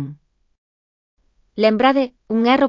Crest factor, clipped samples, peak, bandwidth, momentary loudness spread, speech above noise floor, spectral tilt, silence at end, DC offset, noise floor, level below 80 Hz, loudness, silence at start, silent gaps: 18 dB; under 0.1%; -2 dBFS; 7.4 kHz; 17 LU; 25 dB; -7 dB/octave; 0 s; under 0.1%; -41 dBFS; -60 dBFS; -17 LUFS; 0 s; 0.58-1.17 s